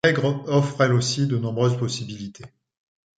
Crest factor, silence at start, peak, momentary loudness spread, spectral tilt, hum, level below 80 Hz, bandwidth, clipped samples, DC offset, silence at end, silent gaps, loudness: 20 dB; 0.05 s; -4 dBFS; 13 LU; -5.5 dB/octave; none; -60 dBFS; 9.2 kHz; under 0.1%; under 0.1%; 0.7 s; none; -22 LUFS